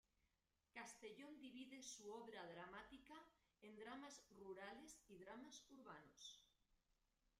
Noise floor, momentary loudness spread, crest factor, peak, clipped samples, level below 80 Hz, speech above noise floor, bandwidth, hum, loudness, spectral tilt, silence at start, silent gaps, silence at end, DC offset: -89 dBFS; 6 LU; 18 dB; -44 dBFS; under 0.1%; -86 dBFS; 29 dB; 15 kHz; none; -60 LUFS; -2.5 dB/octave; 0.75 s; none; 0.1 s; under 0.1%